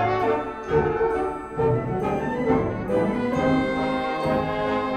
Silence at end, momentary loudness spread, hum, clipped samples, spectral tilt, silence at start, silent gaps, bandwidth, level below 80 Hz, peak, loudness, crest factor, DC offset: 0 s; 4 LU; none; under 0.1%; -7.5 dB/octave; 0 s; none; 9.4 kHz; -44 dBFS; -8 dBFS; -24 LUFS; 16 dB; under 0.1%